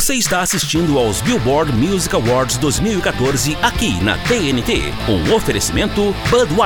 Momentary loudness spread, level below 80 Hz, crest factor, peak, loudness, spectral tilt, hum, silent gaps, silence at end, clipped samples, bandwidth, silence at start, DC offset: 2 LU; -30 dBFS; 14 dB; 0 dBFS; -16 LUFS; -4 dB/octave; none; none; 0 s; under 0.1%; over 20 kHz; 0 s; under 0.1%